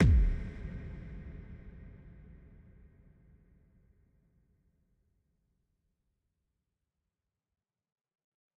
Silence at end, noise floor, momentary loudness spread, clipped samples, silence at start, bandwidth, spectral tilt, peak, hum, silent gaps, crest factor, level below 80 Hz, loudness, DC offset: 6.5 s; under -90 dBFS; 26 LU; under 0.1%; 0 s; 6.4 kHz; -8.5 dB/octave; -16 dBFS; none; none; 22 dB; -40 dBFS; -35 LUFS; under 0.1%